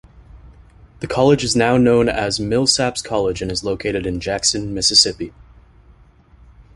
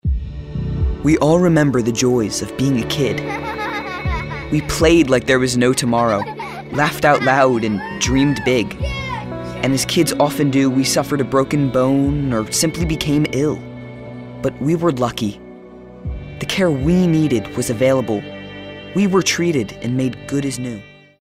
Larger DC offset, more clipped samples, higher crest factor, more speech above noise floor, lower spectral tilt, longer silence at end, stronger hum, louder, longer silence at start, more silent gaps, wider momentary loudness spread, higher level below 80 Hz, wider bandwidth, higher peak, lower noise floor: neither; neither; about the same, 20 dB vs 16 dB; first, 31 dB vs 21 dB; second, -3.5 dB/octave vs -5 dB/octave; first, 1.45 s vs 0.3 s; neither; about the same, -17 LUFS vs -17 LUFS; first, 0.35 s vs 0.05 s; neither; second, 10 LU vs 13 LU; second, -40 dBFS vs -32 dBFS; second, 11.5 kHz vs 16 kHz; about the same, 0 dBFS vs -2 dBFS; first, -49 dBFS vs -38 dBFS